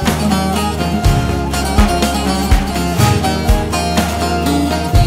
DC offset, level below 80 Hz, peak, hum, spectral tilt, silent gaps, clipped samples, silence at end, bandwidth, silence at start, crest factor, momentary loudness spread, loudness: under 0.1%; -20 dBFS; 0 dBFS; none; -5 dB/octave; none; under 0.1%; 0 s; 16 kHz; 0 s; 12 dB; 3 LU; -15 LUFS